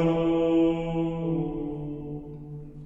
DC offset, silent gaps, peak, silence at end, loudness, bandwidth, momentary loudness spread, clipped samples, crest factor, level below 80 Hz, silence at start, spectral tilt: under 0.1%; none; -14 dBFS; 0 s; -27 LUFS; 7.4 kHz; 17 LU; under 0.1%; 14 dB; -46 dBFS; 0 s; -9.5 dB/octave